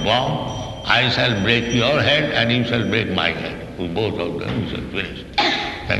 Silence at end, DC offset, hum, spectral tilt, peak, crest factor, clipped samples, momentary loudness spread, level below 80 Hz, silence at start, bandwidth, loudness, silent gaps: 0 s; under 0.1%; none; -5 dB/octave; -2 dBFS; 18 dB; under 0.1%; 10 LU; -40 dBFS; 0 s; 12 kHz; -19 LUFS; none